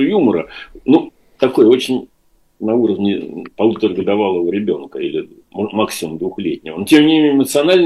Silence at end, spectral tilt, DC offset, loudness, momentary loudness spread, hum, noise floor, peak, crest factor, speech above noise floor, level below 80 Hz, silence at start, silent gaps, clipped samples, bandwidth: 0 s; -5.5 dB/octave; 0.1%; -16 LUFS; 13 LU; none; -45 dBFS; 0 dBFS; 16 dB; 30 dB; -54 dBFS; 0 s; none; under 0.1%; 13 kHz